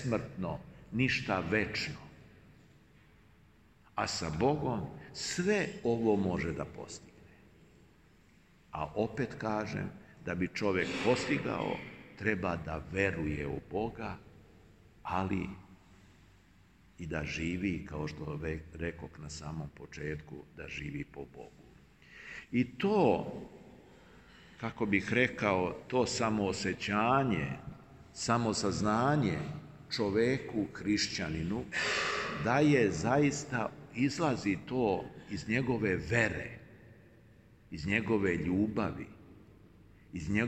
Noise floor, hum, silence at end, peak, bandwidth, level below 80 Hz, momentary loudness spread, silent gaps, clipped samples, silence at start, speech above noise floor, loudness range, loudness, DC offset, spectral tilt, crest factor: -63 dBFS; none; 0 s; -12 dBFS; 12 kHz; -58 dBFS; 16 LU; none; under 0.1%; 0 s; 30 dB; 9 LU; -33 LUFS; under 0.1%; -5.5 dB/octave; 22 dB